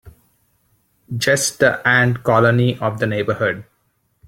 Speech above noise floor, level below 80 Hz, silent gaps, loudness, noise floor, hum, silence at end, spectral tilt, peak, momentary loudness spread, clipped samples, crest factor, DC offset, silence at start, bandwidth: 49 dB; -54 dBFS; none; -17 LUFS; -65 dBFS; none; 0.65 s; -4.5 dB/octave; -2 dBFS; 8 LU; under 0.1%; 18 dB; under 0.1%; 0.05 s; 16.5 kHz